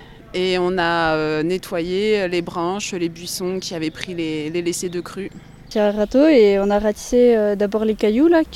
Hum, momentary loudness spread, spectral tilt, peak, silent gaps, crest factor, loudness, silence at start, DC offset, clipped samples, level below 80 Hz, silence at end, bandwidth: none; 11 LU; -5 dB/octave; -4 dBFS; none; 16 dB; -19 LUFS; 0 s; under 0.1%; under 0.1%; -44 dBFS; 0 s; 15.5 kHz